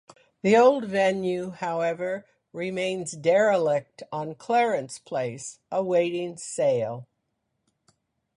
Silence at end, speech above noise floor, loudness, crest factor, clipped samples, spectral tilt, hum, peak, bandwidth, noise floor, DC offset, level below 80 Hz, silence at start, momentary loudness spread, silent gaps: 1.35 s; 53 dB; -25 LUFS; 18 dB; under 0.1%; -5 dB/octave; none; -8 dBFS; 11.5 kHz; -77 dBFS; under 0.1%; -70 dBFS; 0.45 s; 13 LU; none